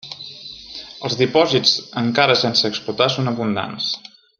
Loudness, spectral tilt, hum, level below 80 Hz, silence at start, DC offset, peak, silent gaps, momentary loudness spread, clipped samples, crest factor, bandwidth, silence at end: -18 LUFS; -4.5 dB/octave; none; -60 dBFS; 0.05 s; under 0.1%; -2 dBFS; none; 18 LU; under 0.1%; 18 dB; 12 kHz; 0.4 s